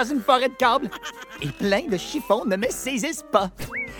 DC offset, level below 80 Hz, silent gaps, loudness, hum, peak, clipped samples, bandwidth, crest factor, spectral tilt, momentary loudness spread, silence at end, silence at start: under 0.1%; -50 dBFS; none; -23 LUFS; none; -4 dBFS; under 0.1%; 18 kHz; 20 dB; -4 dB/octave; 12 LU; 0 s; 0 s